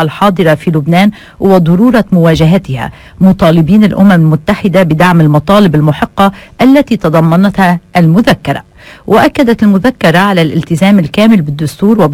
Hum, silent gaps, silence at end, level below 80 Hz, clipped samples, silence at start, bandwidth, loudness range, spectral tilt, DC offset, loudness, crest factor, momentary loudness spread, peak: none; none; 0 s; -34 dBFS; 3%; 0 s; 16 kHz; 2 LU; -7.5 dB/octave; under 0.1%; -8 LUFS; 8 dB; 5 LU; 0 dBFS